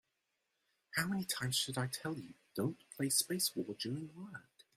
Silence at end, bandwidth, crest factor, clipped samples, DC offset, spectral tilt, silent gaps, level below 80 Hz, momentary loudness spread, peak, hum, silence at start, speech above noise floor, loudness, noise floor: 0.35 s; 16 kHz; 24 dB; under 0.1%; under 0.1%; -3 dB/octave; none; -76 dBFS; 15 LU; -16 dBFS; none; 0.95 s; 46 dB; -38 LUFS; -85 dBFS